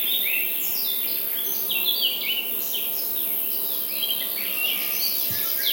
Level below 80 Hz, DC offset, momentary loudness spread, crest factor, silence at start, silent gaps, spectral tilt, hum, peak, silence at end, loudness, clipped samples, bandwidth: -74 dBFS; under 0.1%; 3 LU; 16 dB; 0 s; none; 0.5 dB/octave; none; -10 dBFS; 0 s; -22 LUFS; under 0.1%; 16.5 kHz